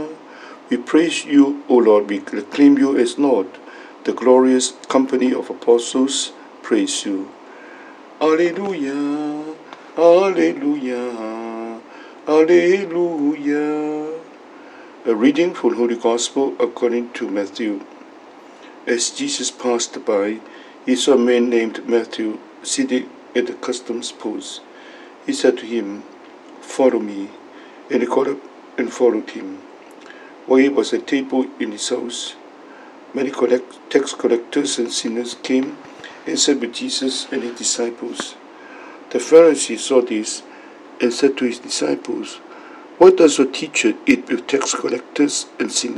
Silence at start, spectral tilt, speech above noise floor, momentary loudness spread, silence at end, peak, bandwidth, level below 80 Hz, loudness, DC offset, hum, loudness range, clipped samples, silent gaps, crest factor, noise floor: 0 s; -3 dB/octave; 24 dB; 18 LU; 0 s; 0 dBFS; 11.5 kHz; -70 dBFS; -18 LUFS; under 0.1%; none; 6 LU; under 0.1%; none; 18 dB; -42 dBFS